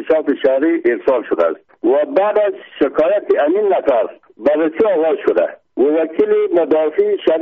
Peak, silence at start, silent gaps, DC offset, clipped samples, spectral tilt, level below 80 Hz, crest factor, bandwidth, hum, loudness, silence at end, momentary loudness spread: -4 dBFS; 0 s; none; under 0.1%; under 0.1%; -3.5 dB/octave; -58 dBFS; 12 dB; 4.8 kHz; none; -16 LUFS; 0 s; 4 LU